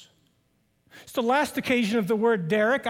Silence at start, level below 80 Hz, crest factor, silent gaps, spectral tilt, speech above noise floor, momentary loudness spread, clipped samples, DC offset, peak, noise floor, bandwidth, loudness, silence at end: 0.95 s; -68 dBFS; 14 dB; none; -5 dB/octave; 45 dB; 3 LU; under 0.1%; under 0.1%; -10 dBFS; -69 dBFS; 17 kHz; -24 LUFS; 0 s